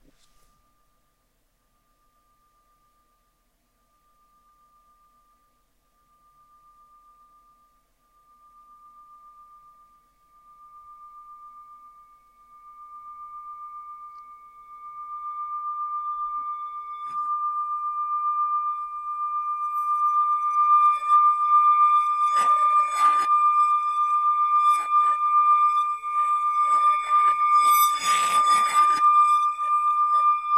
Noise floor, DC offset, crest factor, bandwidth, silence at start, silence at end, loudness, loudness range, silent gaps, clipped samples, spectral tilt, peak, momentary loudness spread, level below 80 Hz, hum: -69 dBFS; under 0.1%; 14 dB; 14.5 kHz; 10.75 s; 0 s; -21 LUFS; 21 LU; none; under 0.1%; 1 dB/octave; -10 dBFS; 19 LU; -70 dBFS; none